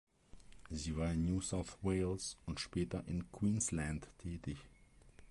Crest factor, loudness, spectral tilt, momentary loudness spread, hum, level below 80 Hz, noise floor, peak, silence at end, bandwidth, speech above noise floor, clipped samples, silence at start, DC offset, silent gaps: 16 dB; -40 LUFS; -5 dB/octave; 10 LU; none; -52 dBFS; -62 dBFS; -26 dBFS; 0 s; 11.5 kHz; 23 dB; under 0.1%; 0.35 s; under 0.1%; none